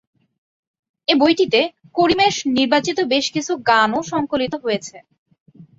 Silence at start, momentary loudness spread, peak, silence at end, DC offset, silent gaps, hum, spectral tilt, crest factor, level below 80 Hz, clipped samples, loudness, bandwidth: 1.1 s; 8 LU; -2 dBFS; 0.15 s; under 0.1%; 5.18-5.26 s, 5.40-5.46 s; none; -3.5 dB/octave; 18 dB; -56 dBFS; under 0.1%; -18 LUFS; 7.8 kHz